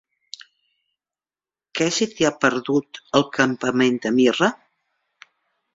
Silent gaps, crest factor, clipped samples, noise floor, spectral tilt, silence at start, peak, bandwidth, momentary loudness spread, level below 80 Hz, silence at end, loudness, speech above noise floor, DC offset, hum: none; 22 dB; under 0.1%; under -90 dBFS; -4 dB/octave; 1.75 s; -2 dBFS; 7.8 kHz; 18 LU; -62 dBFS; 1.2 s; -20 LUFS; over 70 dB; under 0.1%; none